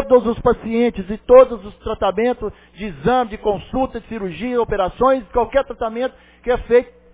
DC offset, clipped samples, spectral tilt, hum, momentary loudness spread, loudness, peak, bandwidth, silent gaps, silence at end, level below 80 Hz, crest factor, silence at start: under 0.1%; under 0.1%; -10 dB/octave; none; 15 LU; -18 LUFS; 0 dBFS; 4 kHz; none; 0.3 s; -38 dBFS; 18 dB; 0 s